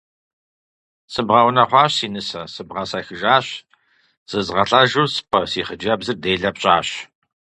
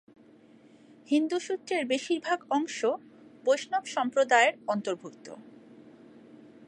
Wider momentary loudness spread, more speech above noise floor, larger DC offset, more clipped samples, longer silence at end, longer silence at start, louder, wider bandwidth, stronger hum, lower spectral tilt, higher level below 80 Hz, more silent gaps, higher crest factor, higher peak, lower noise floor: about the same, 14 LU vs 15 LU; first, 41 dB vs 28 dB; neither; neither; first, 0.55 s vs 0 s; about the same, 1.1 s vs 1.1 s; first, -18 LUFS vs -28 LUFS; about the same, 11 kHz vs 11 kHz; neither; about the same, -4 dB/octave vs -3 dB/octave; first, -52 dBFS vs -84 dBFS; first, 4.17-4.26 s vs none; about the same, 20 dB vs 22 dB; first, 0 dBFS vs -8 dBFS; first, -60 dBFS vs -56 dBFS